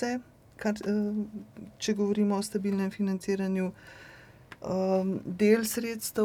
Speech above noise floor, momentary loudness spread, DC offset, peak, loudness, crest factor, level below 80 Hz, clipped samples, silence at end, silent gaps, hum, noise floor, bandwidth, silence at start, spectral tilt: 22 dB; 17 LU; under 0.1%; -12 dBFS; -30 LUFS; 18 dB; -64 dBFS; under 0.1%; 0 s; none; none; -51 dBFS; 18 kHz; 0 s; -5.5 dB/octave